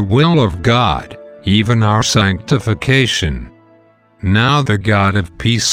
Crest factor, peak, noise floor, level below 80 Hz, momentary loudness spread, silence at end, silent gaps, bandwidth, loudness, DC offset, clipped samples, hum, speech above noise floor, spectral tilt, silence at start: 14 dB; 0 dBFS; -49 dBFS; -36 dBFS; 10 LU; 0 s; none; 14.5 kHz; -14 LUFS; under 0.1%; under 0.1%; none; 36 dB; -5 dB/octave; 0 s